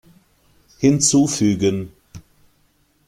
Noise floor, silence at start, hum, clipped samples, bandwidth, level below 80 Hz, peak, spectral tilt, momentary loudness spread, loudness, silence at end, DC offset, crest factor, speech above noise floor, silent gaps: -61 dBFS; 0.8 s; none; under 0.1%; 14.5 kHz; -52 dBFS; -2 dBFS; -4.5 dB/octave; 12 LU; -17 LUFS; 0.9 s; under 0.1%; 18 dB; 44 dB; none